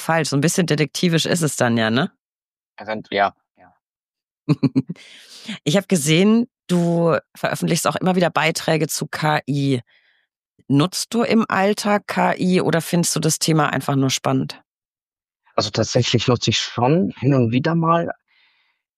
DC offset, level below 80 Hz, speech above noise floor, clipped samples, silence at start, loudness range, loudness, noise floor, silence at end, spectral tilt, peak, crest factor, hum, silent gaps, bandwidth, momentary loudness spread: under 0.1%; -60 dBFS; over 71 dB; under 0.1%; 0 s; 5 LU; -19 LUFS; under -90 dBFS; 0.85 s; -5 dB/octave; -4 dBFS; 16 dB; none; 2.19-2.53 s, 2.62-2.73 s, 3.50-3.55 s, 3.82-4.13 s, 4.23-4.46 s, 10.49-10.54 s, 14.67-14.96 s, 15.02-15.12 s; 15 kHz; 8 LU